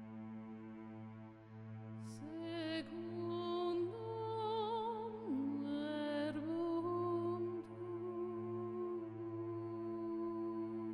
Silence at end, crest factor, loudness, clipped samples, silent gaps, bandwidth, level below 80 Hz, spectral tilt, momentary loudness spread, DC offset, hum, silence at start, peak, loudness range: 0 s; 12 dB; -43 LUFS; under 0.1%; none; 10.5 kHz; -80 dBFS; -7.5 dB/octave; 12 LU; under 0.1%; none; 0 s; -30 dBFS; 4 LU